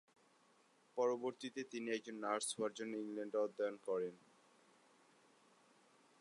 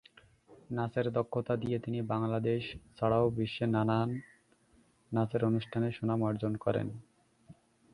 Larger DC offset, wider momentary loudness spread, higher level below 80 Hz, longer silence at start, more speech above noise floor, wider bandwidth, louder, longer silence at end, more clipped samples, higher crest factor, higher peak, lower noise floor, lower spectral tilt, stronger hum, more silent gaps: neither; about the same, 7 LU vs 7 LU; second, under -90 dBFS vs -62 dBFS; first, 0.95 s vs 0.5 s; second, 31 dB vs 35 dB; about the same, 11 kHz vs 11 kHz; second, -43 LUFS vs -33 LUFS; first, 2.05 s vs 0.4 s; neither; about the same, 20 dB vs 18 dB; second, -26 dBFS vs -14 dBFS; first, -73 dBFS vs -67 dBFS; second, -3.5 dB/octave vs -9 dB/octave; neither; neither